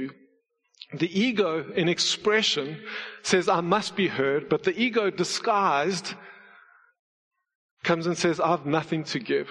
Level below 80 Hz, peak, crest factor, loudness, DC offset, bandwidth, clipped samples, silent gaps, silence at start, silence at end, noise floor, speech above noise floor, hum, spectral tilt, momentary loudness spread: -70 dBFS; -6 dBFS; 20 dB; -25 LUFS; under 0.1%; 11 kHz; under 0.1%; 6.99-7.31 s, 7.55-7.77 s; 0 s; 0 s; -68 dBFS; 43 dB; none; -4 dB/octave; 10 LU